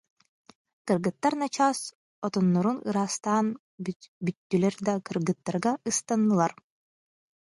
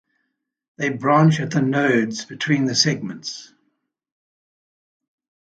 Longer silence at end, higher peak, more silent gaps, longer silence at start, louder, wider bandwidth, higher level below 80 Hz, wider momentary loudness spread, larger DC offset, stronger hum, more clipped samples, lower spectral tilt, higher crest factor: second, 1.05 s vs 2.15 s; second, -10 dBFS vs -2 dBFS; first, 1.95-2.22 s, 3.59-3.78 s, 3.96-4.00 s, 4.08-4.21 s, 4.37-4.50 s vs none; about the same, 0.85 s vs 0.8 s; second, -28 LUFS vs -19 LUFS; first, 11.5 kHz vs 9 kHz; second, -72 dBFS vs -64 dBFS; second, 11 LU vs 14 LU; neither; neither; neither; about the same, -5.5 dB/octave vs -5 dB/octave; about the same, 18 dB vs 20 dB